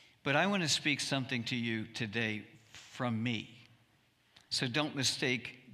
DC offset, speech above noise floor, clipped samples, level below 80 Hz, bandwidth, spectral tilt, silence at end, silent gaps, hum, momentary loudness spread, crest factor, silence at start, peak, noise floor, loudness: under 0.1%; 36 dB; under 0.1%; -74 dBFS; 15.5 kHz; -3.5 dB/octave; 0 s; none; none; 12 LU; 22 dB; 0.25 s; -14 dBFS; -70 dBFS; -34 LUFS